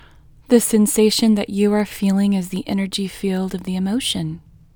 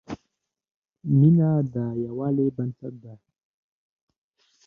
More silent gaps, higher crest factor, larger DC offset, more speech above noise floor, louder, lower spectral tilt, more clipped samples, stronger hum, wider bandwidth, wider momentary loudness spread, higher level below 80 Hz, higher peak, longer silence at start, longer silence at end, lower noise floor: second, none vs 0.71-0.82 s; about the same, 18 dB vs 18 dB; neither; second, 28 dB vs 57 dB; first, -19 LUFS vs -23 LUFS; second, -5 dB/octave vs -11.5 dB/octave; neither; neither; first, over 20 kHz vs 5 kHz; second, 9 LU vs 21 LU; first, -48 dBFS vs -62 dBFS; first, 0 dBFS vs -8 dBFS; first, 0.5 s vs 0.1 s; second, 0.35 s vs 1.5 s; second, -46 dBFS vs -80 dBFS